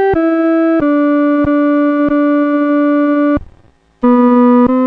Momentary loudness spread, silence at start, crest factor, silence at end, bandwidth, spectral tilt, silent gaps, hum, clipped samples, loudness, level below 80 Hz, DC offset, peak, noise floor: 4 LU; 0 s; 10 dB; 0 s; 4.3 kHz; -9 dB/octave; none; none; under 0.1%; -11 LUFS; -38 dBFS; under 0.1%; -2 dBFS; -47 dBFS